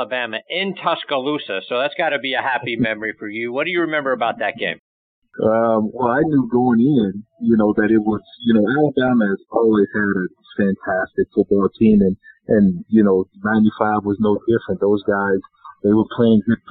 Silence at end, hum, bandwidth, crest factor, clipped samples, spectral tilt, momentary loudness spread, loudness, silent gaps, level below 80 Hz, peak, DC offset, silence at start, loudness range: 0.15 s; none; 4.5 kHz; 16 dB; under 0.1%; -5 dB/octave; 8 LU; -18 LUFS; 4.79-5.22 s; -50 dBFS; -2 dBFS; under 0.1%; 0 s; 4 LU